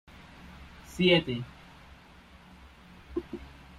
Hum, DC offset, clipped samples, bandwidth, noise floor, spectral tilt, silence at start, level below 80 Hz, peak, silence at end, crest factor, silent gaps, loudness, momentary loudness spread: none; under 0.1%; under 0.1%; 13.5 kHz; -54 dBFS; -6 dB/octave; 0.45 s; -54 dBFS; -12 dBFS; 0.3 s; 22 dB; none; -28 LUFS; 28 LU